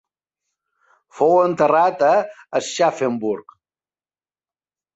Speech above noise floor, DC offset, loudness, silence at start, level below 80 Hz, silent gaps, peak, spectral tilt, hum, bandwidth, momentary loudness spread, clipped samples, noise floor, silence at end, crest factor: over 72 dB; under 0.1%; -18 LUFS; 1.15 s; -70 dBFS; none; -4 dBFS; -4.5 dB/octave; none; 8.2 kHz; 9 LU; under 0.1%; under -90 dBFS; 1.55 s; 18 dB